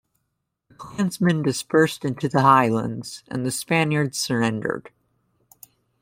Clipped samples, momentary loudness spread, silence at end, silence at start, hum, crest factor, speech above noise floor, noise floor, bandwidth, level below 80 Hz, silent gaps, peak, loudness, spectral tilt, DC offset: under 0.1%; 14 LU; 1.15 s; 0.8 s; none; 20 dB; 56 dB; -77 dBFS; 16.5 kHz; -62 dBFS; none; -2 dBFS; -22 LUFS; -5.5 dB/octave; under 0.1%